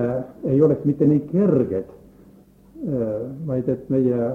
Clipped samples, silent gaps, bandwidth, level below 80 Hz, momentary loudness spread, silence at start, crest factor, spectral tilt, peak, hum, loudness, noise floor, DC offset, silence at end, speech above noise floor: under 0.1%; none; 3.4 kHz; -54 dBFS; 10 LU; 0 s; 16 dB; -12 dB/octave; -6 dBFS; none; -21 LUFS; -50 dBFS; under 0.1%; 0 s; 30 dB